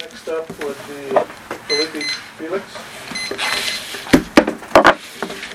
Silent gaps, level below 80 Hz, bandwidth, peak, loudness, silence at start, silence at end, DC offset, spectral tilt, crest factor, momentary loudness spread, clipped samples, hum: none; -44 dBFS; 17 kHz; 0 dBFS; -18 LUFS; 0 s; 0 s; under 0.1%; -3.5 dB/octave; 20 dB; 15 LU; under 0.1%; none